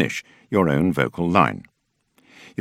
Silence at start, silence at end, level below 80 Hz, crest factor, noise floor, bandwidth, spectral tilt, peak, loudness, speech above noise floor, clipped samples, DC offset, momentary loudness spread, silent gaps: 0 s; 1 s; -52 dBFS; 22 dB; -65 dBFS; 14.5 kHz; -6.5 dB/octave; 0 dBFS; -21 LUFS; 45 dB; under 0.1%; under 0.1%; 15 LU; none